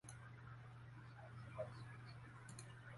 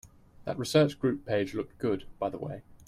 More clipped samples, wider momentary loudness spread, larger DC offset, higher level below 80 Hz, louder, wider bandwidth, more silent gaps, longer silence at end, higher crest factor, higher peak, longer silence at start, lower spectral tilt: neither; second, 7 LU vs 14 LU; neither; second, -72 dBFS vs -58 dBFS; second, -56 LUFS vs -31 LUFS; second, 11.5 kHz vs 15.5 kHz; neither; about the same, 0 s vs 0.05 s; about the same, 20 dB vs 20 dB; second, -36 dBFS vs -10 dBFS; about the same, 0.05 s vs 0.05 s; about the same, -5.5 dB/octave vs -6 dB/octave